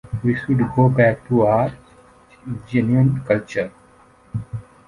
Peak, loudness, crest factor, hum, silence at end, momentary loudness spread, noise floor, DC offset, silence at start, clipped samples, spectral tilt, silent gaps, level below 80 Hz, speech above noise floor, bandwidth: -2 dBFS; -19 LUFS; 18 dB; none; 0.25 s; 16 LU; -51 dBFS; under 0.1%; 0.05 s; under 0.1%; -9.5 dB/octave; none; -48 dBFS; 33 dB; 10.5 kHz